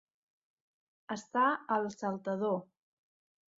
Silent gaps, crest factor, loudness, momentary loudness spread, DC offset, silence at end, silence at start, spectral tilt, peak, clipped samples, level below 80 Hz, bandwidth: none; 20 dB; -34 LUFS; 10 LU; under 0.1%; 0.95 s; 1.1 s; -4.5 dB/octave; -16 dBFS; under 0.1%; -82 dBFS; 7.6 kHz